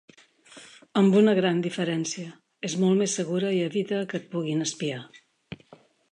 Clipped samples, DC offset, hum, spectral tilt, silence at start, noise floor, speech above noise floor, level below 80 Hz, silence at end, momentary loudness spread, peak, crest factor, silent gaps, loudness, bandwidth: under 0.1%; under 0.1%; none; -5 dB/octave; 0.55 s; -56 dBFS; 31 dB; -72 dBFS; 0.55 s; 24 LU; -10 dBFS; 16 dB; none; -25 LUFS; 10.5 kHz